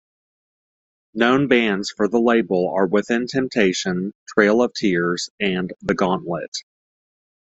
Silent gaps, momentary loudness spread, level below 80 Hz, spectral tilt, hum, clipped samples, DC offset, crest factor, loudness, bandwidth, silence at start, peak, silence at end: 4.15-4.26 s, 5.30-5.38 s, 6.48-6.52 s; 9 LU; -58 dBFS; -5 dB/octave; none; under 0.1%; under 0.1%; 18 dB; -20 LUFS; 8.2 kHz; 1.15 s; -2 dBFS; 0.95 s